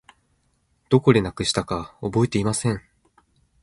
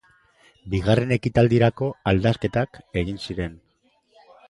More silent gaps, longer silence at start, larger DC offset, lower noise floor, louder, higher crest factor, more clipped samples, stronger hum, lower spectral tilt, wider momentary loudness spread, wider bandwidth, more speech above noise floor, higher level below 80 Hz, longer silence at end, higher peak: neither; first, 0.9 s vs 0.65 s; neither; about the same, -67 dBFS vs -64 dBFS; about the same, -22 LUFS vs -23 LUFS; about the same, 22 dB vs 20 dB; neither; neither; second, -5.5 dB/octave vs -7.5 dB/octave; about the same, 11 LU vs 11 LU; about the same, 11.5 kHz vs 11 kHz; about the same, 46 dB vs 43 dB; second, -48 dBFS vs -42 dBFS; about the same, 0.85 s vs 0.95 s; about the same, -2 dBFS vs -4 dBFS